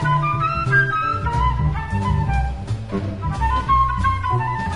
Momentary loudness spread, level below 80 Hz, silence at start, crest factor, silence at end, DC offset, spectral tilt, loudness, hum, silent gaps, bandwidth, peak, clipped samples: 8 LU; -28 dBFS; 0 s; 14 dB; 0 s; under 0.1%; -7 dB/octave; -20 LUFS; none; none; 10.5 kHz; -6 dBFS; under 0.1%